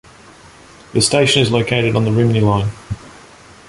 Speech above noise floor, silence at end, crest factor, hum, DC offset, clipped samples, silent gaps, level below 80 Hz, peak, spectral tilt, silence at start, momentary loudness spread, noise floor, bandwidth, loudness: 28 dB; 0.6 s; 16 dB; none; under 0.1%; under 0.1%; none; -42 dBFS; 0 dBFS; -5 dB/octave; 0.95 s; 15 LU; -42 dBFS; 11.5 kHz; -15 LUFS